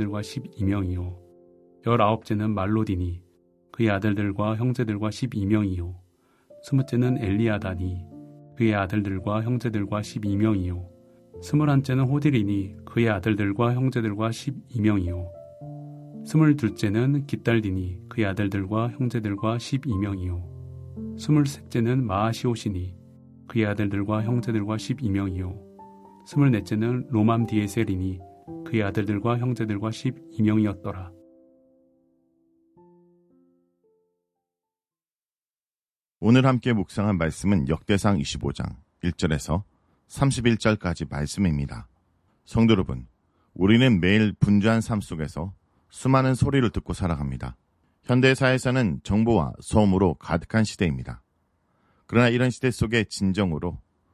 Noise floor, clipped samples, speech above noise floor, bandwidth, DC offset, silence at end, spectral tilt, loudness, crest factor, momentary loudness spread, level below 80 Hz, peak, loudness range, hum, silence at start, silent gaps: under -90 dBFS; under 0.1%; over 67 dB; 13.5 kHz; under 0.1%; 0.35 s; -7 dB/octave; -24 LUFS; 20 dB; 14 LU; -42 dBFS; -4 dBFS; 4 LU; none; 0 s; 35.13-35.86 s, 35.92-36.05 s, 36.11-36.15 s